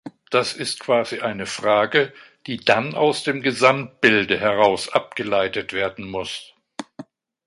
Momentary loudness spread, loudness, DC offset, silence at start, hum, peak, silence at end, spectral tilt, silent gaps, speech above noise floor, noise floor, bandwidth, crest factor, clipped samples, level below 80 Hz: 15 LU; -20 LUFS; under 0.1%; 0.05 s; none; 0 dBFS; 0.45 s; -4 dB/octave; none; 22 dB; -42 dBFS; 11.5 kHz; 22 dB; under 0.1%; -58 dBFS